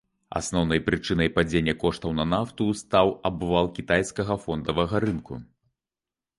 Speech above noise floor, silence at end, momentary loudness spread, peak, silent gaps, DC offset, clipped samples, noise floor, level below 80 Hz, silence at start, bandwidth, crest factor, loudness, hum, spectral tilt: over 65 dB; 0.95 s; 6 LU; -6 dBFS; none; under 0.1%; under 0.1%; under -90 dBFS; -44 dBFS; 0.3 s; 11.5 kHz; 20 dB; -25 LUFS; none; -5.5 dB/octave